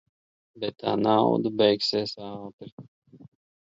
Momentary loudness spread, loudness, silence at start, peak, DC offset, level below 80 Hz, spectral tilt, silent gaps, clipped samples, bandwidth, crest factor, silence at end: 20 LU; -25 LUFS; 0.55 s; -6 dBFS; under 0.1%; -68 dBFS; -6 dB/octave; 2.53-2.58 s, 2.72-2.78 s, 2.88-3.02 s; under 0.1%; 7.8 kHz; 20 dB; 0.45 s